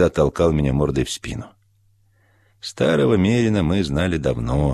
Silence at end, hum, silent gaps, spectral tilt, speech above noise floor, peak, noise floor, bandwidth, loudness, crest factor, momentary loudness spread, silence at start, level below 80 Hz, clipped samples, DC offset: 0 s; none; none; -6.5 dB/octave; 40 dB; -4 dBFS; -59 dBFS; 13.5 kHz; -19 LUFS; 16 dB; 13 LU; 0 s; -34 dBFS; under 0.1%; under 0.1%